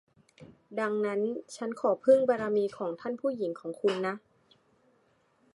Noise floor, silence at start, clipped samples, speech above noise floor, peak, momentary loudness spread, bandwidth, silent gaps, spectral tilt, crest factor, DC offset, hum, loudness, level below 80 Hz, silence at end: -69 dBFS; 0.4 s; under 0.1%; 40 dB; -10 dBFS; 12 LU; 11.5 kHz; none; -6 dB/octave; 20 dB; under 0.1%; none; -30 LUFS; -78 dBFS; 1.35 s